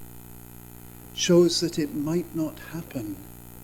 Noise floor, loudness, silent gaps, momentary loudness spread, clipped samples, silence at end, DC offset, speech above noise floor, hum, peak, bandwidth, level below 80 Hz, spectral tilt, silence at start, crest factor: -44 dBFS; -25 LUFS; none; 25 LU; under 0.1%; 0 s; under 0.1%; 19 dB; 60 Hz at -45 dBFS; -8 dBFS; 19.5 kHz; -52 dBFS; -5 dB/octave; 0 s; 18 dB